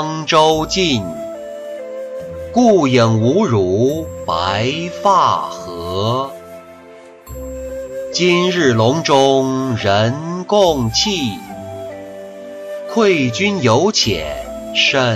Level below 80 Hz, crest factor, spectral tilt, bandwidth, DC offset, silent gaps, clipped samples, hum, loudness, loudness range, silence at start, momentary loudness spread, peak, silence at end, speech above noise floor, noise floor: -42 dBFS; 14 dB; -4.5 dB/octave; 14 kHz; under 0.1%; none; under 0.1%; none; -15 LUFS; 4 LU; 0 s; 17 LU; -2 dBFS; 0 s; 25 dB; -39 dBFS